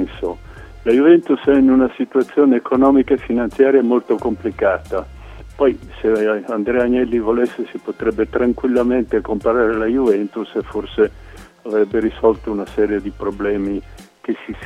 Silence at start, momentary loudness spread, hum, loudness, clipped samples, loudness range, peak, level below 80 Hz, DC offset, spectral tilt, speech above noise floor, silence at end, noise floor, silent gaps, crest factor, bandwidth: 0 s; 12 LU; none; -17 LUFS; under 0.1%; 5 LU; 0 dBFS; -40 dBFS; under 0.1%; -7.5 dB/octave; 20 dB; 0 s; -36 dBFS; none; 16 dB; 9.8 kHz